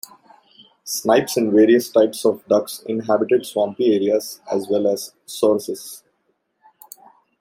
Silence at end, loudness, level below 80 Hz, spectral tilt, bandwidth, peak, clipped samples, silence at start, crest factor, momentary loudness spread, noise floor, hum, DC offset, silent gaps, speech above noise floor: 1.45 s; -19 LUFS; -68 dBFS; -4.5 dB/octave; 16.5 kHz; -2 dBFS; under 0.1%; 0.85 s; 18 dB; 16 LU; -69 dBFS; none; under 0.1%; none; 50 dB